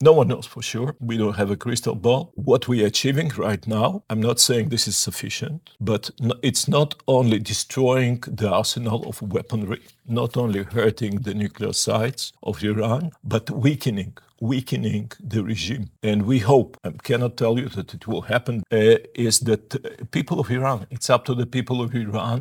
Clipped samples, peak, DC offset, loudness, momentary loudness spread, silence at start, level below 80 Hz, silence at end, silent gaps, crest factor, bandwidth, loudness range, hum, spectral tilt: under 0.1%; -2 dBFS; under 0.1%; -22 LUFS; 10 LU; 0 s; -60 dBFS; 0 s; none; 20 dB; 19 kHz; 4 LU; none; -5 dB/octave